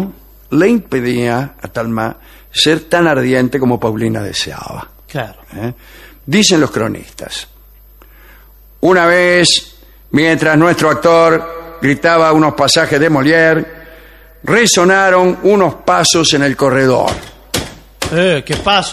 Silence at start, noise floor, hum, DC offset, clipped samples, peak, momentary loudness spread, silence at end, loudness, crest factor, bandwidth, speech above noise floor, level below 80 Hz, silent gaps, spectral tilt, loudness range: 0 s; -41 dBFS; none; under 0.1%; under 0.1%; 0 dBFS; 16 LU; 0 s; -11 LUFS; 12 dB; 15.5 kHz; 29 dB; -40 dBFS; none; -4 dB/octave; 6 LU